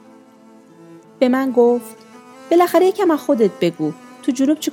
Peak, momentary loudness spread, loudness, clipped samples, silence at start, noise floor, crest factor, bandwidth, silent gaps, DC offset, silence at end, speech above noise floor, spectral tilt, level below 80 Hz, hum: -2 dBFS; 11 LU; -17 LUFS; under 0.1%; 1.2 s; -46 dBFS; 16 dB; 18 kHz; none; under 0.1%; 0 s; 30 dB; -5.5 dB/octave; -74 dBFS; none